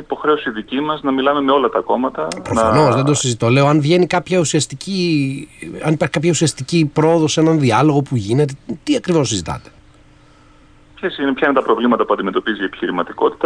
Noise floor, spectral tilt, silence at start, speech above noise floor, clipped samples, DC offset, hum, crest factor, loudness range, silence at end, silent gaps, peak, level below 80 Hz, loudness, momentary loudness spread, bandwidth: -47 dBFS; -5.5 dB/octave; 0 s; 31 dB; under 0.1%; under 0.1%; none; 14 dB; 5 LU; 0 s; none; -2 dBFS; -48 dBFS; -16 LUFS; 9 LU; 10.5 kHz